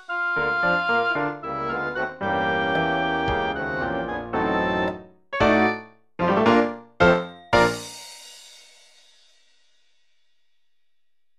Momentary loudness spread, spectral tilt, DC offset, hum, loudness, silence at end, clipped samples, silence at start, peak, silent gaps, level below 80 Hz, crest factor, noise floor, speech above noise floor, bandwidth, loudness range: 14 LU; -5.5 dB/octave; under 0.1%; none; -23 LUFS; 2.8 s; under 0.1%; 0 s; -4 dBFS; none; -48 dBFS; 22 dB; -83 dBFS; 58 dB; 14 kHz; 4 LU